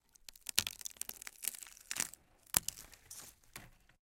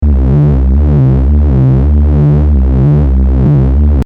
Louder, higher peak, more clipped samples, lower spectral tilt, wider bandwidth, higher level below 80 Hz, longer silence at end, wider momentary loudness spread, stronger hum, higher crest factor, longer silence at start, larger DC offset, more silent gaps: second, -38 LUFS vs -9 LUFS; second, -6 dBFS vs 0 dBFS; neither; second, 0.5 dB/octave vs -11.5 dB/octave; first, 17 kHz vs 2.9 kHz; second, -66 dBFS vs -10 dBFS; first, 0.35 s vs 0 s; first, 20 LU vs 1 LU; neither; first, 38 dB vs 6 dB; first, 0.3 s vs 0 s; neither; neither